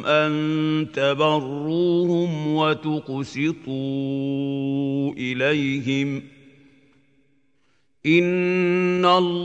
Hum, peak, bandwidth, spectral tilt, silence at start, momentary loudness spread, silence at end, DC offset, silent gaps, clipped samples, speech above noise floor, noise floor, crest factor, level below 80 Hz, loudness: none; -4 dBFS; 8.2 kHz; -6.5 dB/octave; 0 s; 8 LU; 0 s; under 0.1%; none; under 0.1%; 47 dB; -68 dBFS; 18 dB; -66 dBFS; -22 LUFS